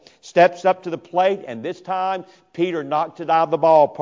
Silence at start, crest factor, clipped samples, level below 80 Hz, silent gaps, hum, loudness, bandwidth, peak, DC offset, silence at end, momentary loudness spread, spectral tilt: 0.25 s; 16 dB; under 0.1%; -70 dBFS; none; none; -20 LUFS; 7.6 kHz; -4 dBFS; under 0.1%; 0 s; 13 LU; -6 dB/octave